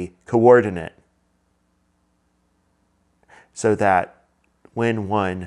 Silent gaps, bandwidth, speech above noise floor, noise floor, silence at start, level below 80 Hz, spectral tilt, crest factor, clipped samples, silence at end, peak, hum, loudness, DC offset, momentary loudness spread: none; 10.5 kHz; 48 dB; -66 dBFS; 0 s; -62 dBFS; -6.5 dB/octave; 22 dB; under 0.1%; 0 s; 0 dBFS; none; -19 LUFS; under 0.1%; 21 LU